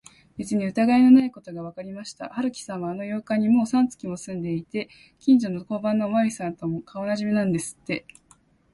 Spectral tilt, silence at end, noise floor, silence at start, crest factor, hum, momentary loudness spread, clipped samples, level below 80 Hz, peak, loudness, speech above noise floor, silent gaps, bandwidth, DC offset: -6.5 dB/octave; 0.75 s; -59 dBFS; 0.4 s; 18 dB; none; 18 LU; under 0.1%; -62 dBFS; -6 dBFS; -24 LUFS; 36 dB; none; 11.5 kHz; under 0.1%